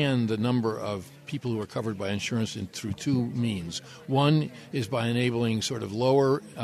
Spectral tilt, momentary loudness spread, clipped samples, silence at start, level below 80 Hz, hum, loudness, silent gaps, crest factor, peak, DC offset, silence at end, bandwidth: -6 dB/octave; 11 LU; under 0.1%; 0 s; -62 dBFS; none; -28 LUFS; none; 16 dB; -12 dBFS; under 0.1%; 0 s; 13.5 kHz